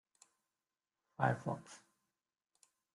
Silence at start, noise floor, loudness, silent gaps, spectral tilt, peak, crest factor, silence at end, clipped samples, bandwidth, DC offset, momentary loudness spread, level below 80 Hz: 1.2 s; under -90 dBFS; -39 LUFS; none; -7 dB/octave; -18 dBFS; 26 dB; 1.15 s; under 0.1%; 11.5 kHz; under 0.1%; 23 LU; -78 dBFS